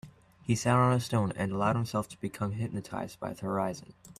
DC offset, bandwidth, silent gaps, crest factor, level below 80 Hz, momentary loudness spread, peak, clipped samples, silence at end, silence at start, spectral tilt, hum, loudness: under 0.1%; 14.5 kHz; none; 20 dB; -60 dBFS; 13 LU; -10 dBFS; under 0.1%; 0.1 s; 0.05 s; -6.5 dB/octave; none; -31 LUFS